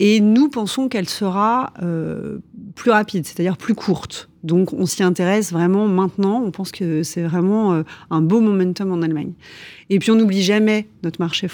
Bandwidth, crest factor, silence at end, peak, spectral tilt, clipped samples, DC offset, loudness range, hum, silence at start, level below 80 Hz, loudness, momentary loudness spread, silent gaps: 20 kHz; 16 dB; 0 s; -2 dBFS; -6 dB/octave; under 0.1%; under 0.1%; 3 LU; none; 0 s; -58 dBFS; -18 LUFS; 11 LU; none